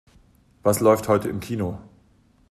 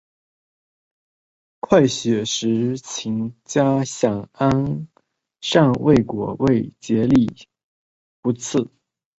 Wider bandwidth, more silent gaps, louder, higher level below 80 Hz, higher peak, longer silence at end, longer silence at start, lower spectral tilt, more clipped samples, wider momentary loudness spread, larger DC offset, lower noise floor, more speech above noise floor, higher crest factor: first, 14.5 kHz vs 8.2 kHz; second, none vs 7.64-8.23 s; about the same, -22 LUFS vs -20 LUFS; about the same, -54 dBFS vs -50 dBFS; about the same, -4 dBFS vs -2 dBFS; about the same, 0.65 s vs 0.55 s; second, 0.65 s vs 1.7 s; about the same, -6 dB/octave vs -5.5 dB/octave; neither; about the same, 12 LU vs 11 LU; neither; second, -59 dBFS vs -64 dBFS; second, 37 dB vs 45 dB; about the same, 20 dB vs 20 dB